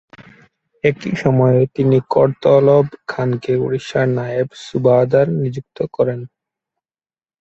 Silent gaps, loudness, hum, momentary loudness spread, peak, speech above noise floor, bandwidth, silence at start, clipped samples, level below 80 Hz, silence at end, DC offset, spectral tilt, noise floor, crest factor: none; -16 LUFS; none; 9 LU; 0 dBFS; over 75 dB; 8 kHz; 0.2 s; under 0.1%; -54 dBFS; 1.15 s; under 0.1%; -8 dB/octave; under -90 dBFS; 16 dB